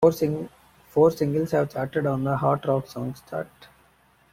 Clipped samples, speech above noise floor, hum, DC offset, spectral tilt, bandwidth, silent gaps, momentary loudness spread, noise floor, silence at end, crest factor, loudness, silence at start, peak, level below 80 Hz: under 0.1%; 36 dB; none; under 0.1%; -7.5 dB/octave; 16 kHz; none; 13 LU; -60 dBFS; 0.85 s; 20 dB; -25 LUFS; 0 s; -6 dBFS; -58 dBFS